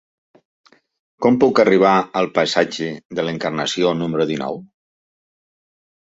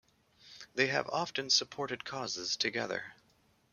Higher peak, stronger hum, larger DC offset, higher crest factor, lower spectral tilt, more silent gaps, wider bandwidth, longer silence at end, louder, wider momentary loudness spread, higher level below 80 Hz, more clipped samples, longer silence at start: first, -2 dBFS vs -14 dBFS; neither; neither; about the same, 18 dB vs 22 dB; first, -5 dB/octave vs -2 dB/octave; first, 3.05-3.09 s vs none; second, 8 kHz vs 13 kHz; first, 1.45 s vs 0.6 s; first, -18 LUFS vs -33 LUFS; about the same, 12 LU vs 12 LU; first, -60 dBFS vs -76 dBFS; neither; first, 1.2 s vs 0.45 s